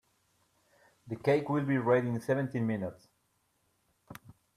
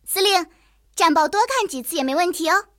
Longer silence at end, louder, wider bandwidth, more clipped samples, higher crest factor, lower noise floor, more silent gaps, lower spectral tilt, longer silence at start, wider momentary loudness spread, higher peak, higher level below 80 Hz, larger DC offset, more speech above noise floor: first, 0.45 s vs 0.15 s; second, -31 LUFS vs -19 LUFS; second, 15 kHz vs 17.5 kHz; neither; about the same, 20 dB vs 16 dB; first, -75 dBFS vs -56 dBFS; neither; first, -8 dB/octave vs -0.5 dB/octave; first, 1.05 s vs 0.05 s; first, 24 LU vs 7 LU; second, -14 dBFS vs -4 dBFS; second, -72 dBFS vs -58 dBFS; neither; first, 45 dB vs 36 dB